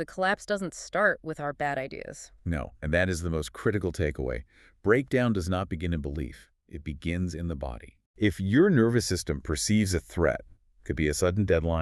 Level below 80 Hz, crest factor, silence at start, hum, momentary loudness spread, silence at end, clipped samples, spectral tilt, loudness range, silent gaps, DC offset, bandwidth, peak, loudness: -42 dBFS; 20 dB; 0 s; none; 14 LU; 0 s; under 0.1%; -5.5 dB/octave; 5 LU; 8.06-8.14 s; under 0.1%; 13.5 kHz; -8 dBFS; -28 LUFS